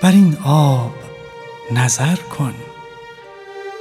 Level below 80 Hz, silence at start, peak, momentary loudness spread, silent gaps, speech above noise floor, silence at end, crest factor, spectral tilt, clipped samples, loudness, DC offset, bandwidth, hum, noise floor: -56 dBFS; 0 s; 0 dBFS; 23 LU; none; 23 dB; 0 s; 16 dB; -5.5 dB/octave; under 0.1%; -16 LUFS; under 0.1%; 15 kHz; none; -37 dBFS